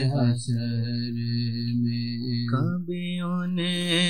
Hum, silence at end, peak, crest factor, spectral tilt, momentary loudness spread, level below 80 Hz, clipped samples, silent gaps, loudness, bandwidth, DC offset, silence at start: none; 0 s; -12 dBFS; 14 dB; -6 dB/octave; 5 LU; -64 dBFS; under 0.1%; none; -27 LUFS; 10.5 kHz; 0.6%; 0 s